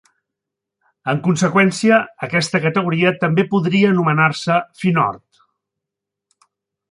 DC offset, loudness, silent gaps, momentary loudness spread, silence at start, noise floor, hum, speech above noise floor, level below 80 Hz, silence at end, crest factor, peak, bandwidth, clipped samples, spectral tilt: under 0.1%; -16 LUFS; none; 6 LU; 1.05 s; -83 dBFS; 50 Hz at -35 dBFS; 67 dB; -60 dBFS; 1.75 s; 16 dB; -2 dBFS; 11.5 kHz; under 0.1%; -6 dB/octave